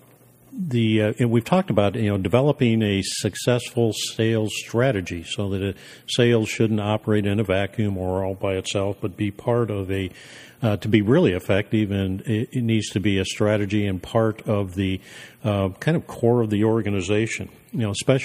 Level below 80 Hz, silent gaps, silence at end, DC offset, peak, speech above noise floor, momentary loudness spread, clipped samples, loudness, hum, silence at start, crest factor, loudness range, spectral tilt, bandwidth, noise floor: -54 dBFS; none; 0 s; under 0.1%; -2 dBFS; 30 dB; 8 LU; under 0.1%; -22 LUFS; none; 0.5 s; 20 dB; 3 LU; -6 dB/octave; 15.5 kHz; -52 dBFS